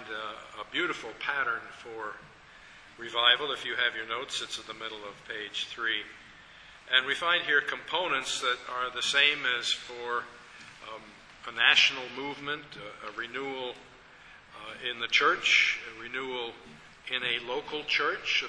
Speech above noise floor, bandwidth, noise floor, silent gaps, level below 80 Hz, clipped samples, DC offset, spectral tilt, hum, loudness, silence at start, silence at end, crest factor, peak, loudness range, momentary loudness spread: 23 dB; 11 kHz; -53 dBFS; none; -66 dBFS; under 0.1%; under 0.1%; -0.5 dB/octave; none; -28 LUFS; 0 s; 0 s; 26 dB; -6 dBFS; 5 LU; 21 LU